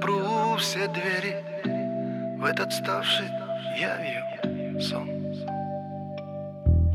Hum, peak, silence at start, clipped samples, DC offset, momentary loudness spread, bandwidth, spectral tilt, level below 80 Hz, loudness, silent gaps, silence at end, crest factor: none; -10 dBFS; 0 s; under 0.1%; under 0.1%; 9 LU; 14.5 kHz; -5 dB/octave; -38 dBFS; -28 LUFS; none; 0 s; 18 dB